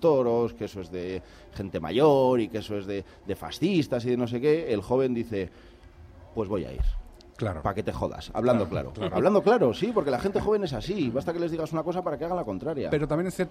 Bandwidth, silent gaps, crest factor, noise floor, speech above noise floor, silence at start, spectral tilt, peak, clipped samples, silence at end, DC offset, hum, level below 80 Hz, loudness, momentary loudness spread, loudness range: 15 kHz; none; 18 dB; -49 dBFS; 23 dB; 0 s; -7 dB/octave; -10 dBFS; under 0.1%; 0 s; under 0.1%; none; -42 dBFS; -27 LUFS; 13 LU; 5 LU